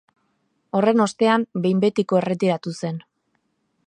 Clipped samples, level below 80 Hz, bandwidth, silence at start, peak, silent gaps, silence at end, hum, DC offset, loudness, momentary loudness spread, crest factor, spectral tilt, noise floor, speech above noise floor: under 0.1%; -70 dBFS; 10.5 kHz; 0.75 s; -4 dBFS; none; 0.85 s; none; under 0.1%; -21 LUFS; 11 LU; 18 dB; -6.5 dB/octave; -71 dBFS; 51 dB